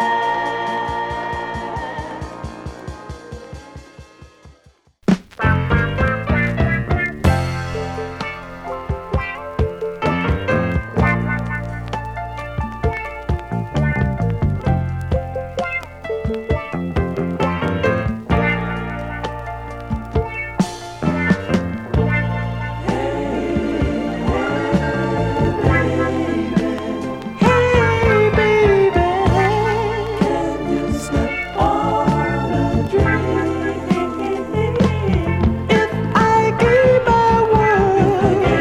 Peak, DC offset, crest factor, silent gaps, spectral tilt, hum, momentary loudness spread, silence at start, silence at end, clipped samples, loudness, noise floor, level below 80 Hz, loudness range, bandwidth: -2 dBFS; under 0.1%; 18 dB; none; -7 dB/octave; none; 12 LU; 0 s; 0 s; under 0.1%; -19 LUFS; -53 dBFS; -30 dBFS; 7 LU; 13.5 kHz